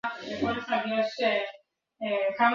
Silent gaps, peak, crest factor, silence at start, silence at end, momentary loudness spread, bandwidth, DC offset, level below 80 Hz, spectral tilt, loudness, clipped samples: none; -10 dBFS; 18 dB; 0.05 s; 0 s; 8 LU; 7.4 kHz; under 0.1%; -62 dBFS; -5 dB/octave; -29 LUFS; under 0.1%